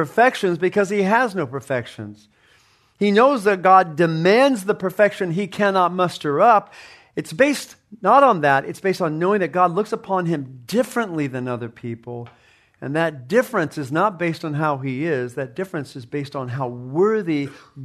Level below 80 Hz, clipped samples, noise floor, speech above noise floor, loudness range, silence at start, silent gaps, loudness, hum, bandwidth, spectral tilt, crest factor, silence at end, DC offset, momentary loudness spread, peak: -66 dBFS; under 0.1%; -57 dBFS; 37 dB; 7 LU; 0 s; none; -20 LUFS; none; 13.5 kHz; -6 dB/octave; 18 dB; 0 s; under 0.1%; 15 LU; -2 dBFS